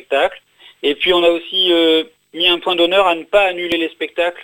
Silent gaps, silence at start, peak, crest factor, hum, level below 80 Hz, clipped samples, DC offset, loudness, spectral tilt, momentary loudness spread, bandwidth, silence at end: none; 0.1 s; 0 dBFS; 16 dB; none; -50 dBFS; under 0.1%; under 0.1%; -15 LUFS; -3.5 dB/octave; 8 LU; 16.5 kHz; 0 s